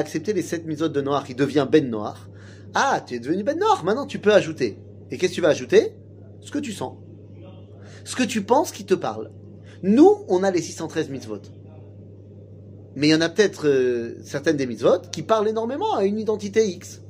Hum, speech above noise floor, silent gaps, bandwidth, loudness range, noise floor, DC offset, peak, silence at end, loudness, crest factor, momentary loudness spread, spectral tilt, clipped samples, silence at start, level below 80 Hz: none; 21 dB; none; 15.5 kHz; 4 LU; -43 dBFS; under 0.1%; -4 dBFS; 0 s; -22 LUFS; 20 dB; 18 LU; -5 dB/octave; under 0.1%; 0 s; -68 dBFS